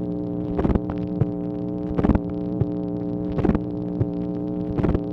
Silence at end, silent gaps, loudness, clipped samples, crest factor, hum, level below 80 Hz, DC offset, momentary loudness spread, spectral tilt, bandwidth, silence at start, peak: 0 s; none; -25 LUFS; under 0.1%; 20 dB; none; -34 dBFS; under 0.1%; 5 LU; -11 dB/octave; 5.6 kHz; 0 s; -4 dBFS